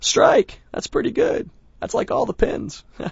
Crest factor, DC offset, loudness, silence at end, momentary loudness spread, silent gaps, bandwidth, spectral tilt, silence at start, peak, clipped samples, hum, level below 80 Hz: 18 dB; under 0.1%; -21 LUFS; 0 s; 18 LU; none; 8 kHz; -3.5 dB/octave; 0 s; -2 dBFS; under 0.1%; none; -38 dBFS